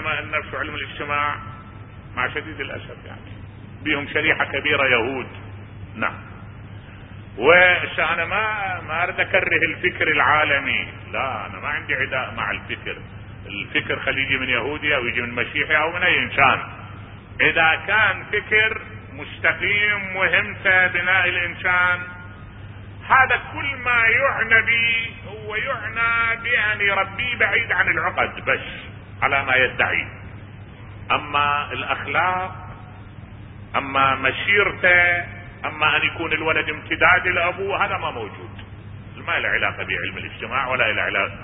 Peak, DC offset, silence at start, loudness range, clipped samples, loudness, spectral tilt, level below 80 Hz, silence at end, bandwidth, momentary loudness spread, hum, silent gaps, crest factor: 0 dBFS; under 0.1%; 0 s; 6 LU; under 0.1%; -19 LUFS; -9 dB/octave; -46 dBFS; 0 s; 4 kHz; 23 LU; none; none; 22 dB